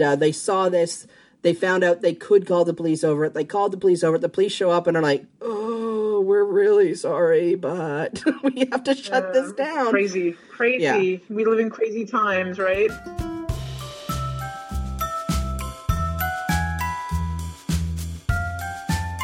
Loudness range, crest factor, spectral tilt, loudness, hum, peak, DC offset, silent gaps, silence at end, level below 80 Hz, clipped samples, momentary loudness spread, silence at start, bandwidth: 6 LU; 16 dB; -5.5 dB/octave; -22 LUFS; none; -6 dBFS; under 0.1%; none; 0 s; -36 dBFS; under 0.1%; 11 LU; 0 s; 16 kHz